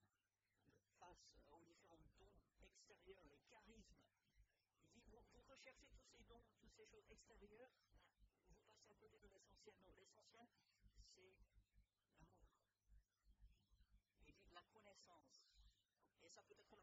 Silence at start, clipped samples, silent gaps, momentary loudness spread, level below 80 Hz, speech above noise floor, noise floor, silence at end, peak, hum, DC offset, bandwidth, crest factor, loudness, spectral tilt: 0 s; under 0.1%; none; 2 LU; -80 dBFS; over 18 dB; under -90 dBFS; 0 s; -50 dBFS; none; under 0.1%; 7.6 kHz; 24 dB; -69 LUFS; -3 dB/octave